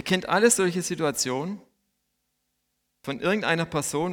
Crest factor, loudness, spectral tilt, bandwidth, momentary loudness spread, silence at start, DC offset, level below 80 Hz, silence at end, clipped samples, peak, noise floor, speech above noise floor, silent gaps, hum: 20 dB; -24 LUFS; -3.5 dB/octave; 18.5 kHz; 15 LU; 0.05 s; under 0.1%; -62 dBFS; 0 s; under 0.1%; -8 dBFS; -76 dBFS; 52 dB; none; 60 Hz at -60 dBFS